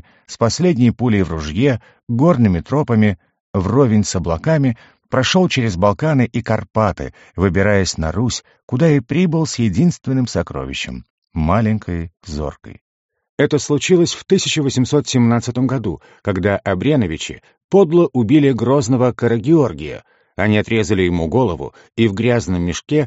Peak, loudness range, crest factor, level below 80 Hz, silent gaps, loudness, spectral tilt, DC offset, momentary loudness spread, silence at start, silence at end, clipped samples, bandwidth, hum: -2 dBFS; 3 LU; 16 dB; -38 dBFS; 2.03-2.07 s, 3.40-3.54 s, 8.63-8.68 s, 11.10-11.22 s, 12.81-13.09 s, 13.29-13.38 s, 17.64-17.69 s; -17 LUFS; -6 dB/octave; under 0.1%; 12 LU; 0.3 s; 0 s; under 0.1%; 8 kHz; none